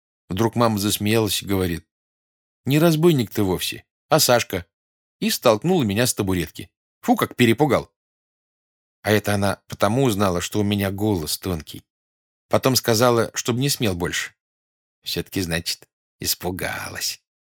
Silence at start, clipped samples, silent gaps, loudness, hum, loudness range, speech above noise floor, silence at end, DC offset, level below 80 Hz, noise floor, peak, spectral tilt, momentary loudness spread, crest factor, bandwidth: 0.3 s; under 0.1%; 1.91-2.64 s, 3.91-4.09 s, 4.73-5.20 s, 6.77-7.01 s, 7.96-9.03 s, 11.90-12.49 s, 14.40-15.02 s, 15.93-16.19 s; -21 LUFS; none; 3 LU; over 69 dB; 0.3 s; under 0.1%; -50 dBFS; under -90 dBFS; -2 dBFS; -4.5 dB/octave; 12 LU; 20 dB; over 20 kHz